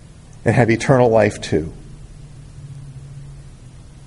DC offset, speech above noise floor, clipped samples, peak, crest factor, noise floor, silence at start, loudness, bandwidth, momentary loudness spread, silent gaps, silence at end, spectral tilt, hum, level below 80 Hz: under 0.1%; 24 dB; under 0.1%; 0 dBFS; 20 dB; -40 dBFS; 0.35 s; -16 LUFS; 11.5 kHz; 26 LU; none; 0.05 s; -6.5 dB/octave; none; -42 dBFS